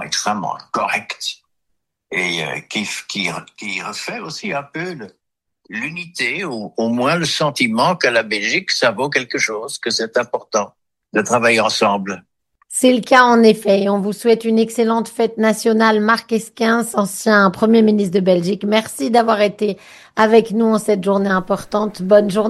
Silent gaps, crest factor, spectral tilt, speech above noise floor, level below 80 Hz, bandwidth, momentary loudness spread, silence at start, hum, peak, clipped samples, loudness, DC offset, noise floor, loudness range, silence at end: none; 16 dB; -4 dB/octave; 57 dB; -60 dBFS; 12.5 kHz; 12 LU; 0 s; none; 0 dBFS; under 0.1%; -17 LUFS; under 0.1%; -74 dBFS; 9 LU; 0 s